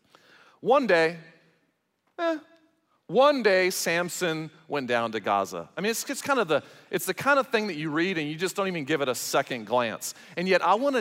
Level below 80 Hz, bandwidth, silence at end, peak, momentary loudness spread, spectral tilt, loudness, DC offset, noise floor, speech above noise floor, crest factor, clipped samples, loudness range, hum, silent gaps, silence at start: -78 dBFS; 16 kHz; 0 s; -8 dBFS; 11 LU; -3.5 dB/octave; -26 LUFS; under 0.1%; -73 dBFS; 47 dB; 18 dB; under 0.1%; 2 LU; none; none; 0.65 s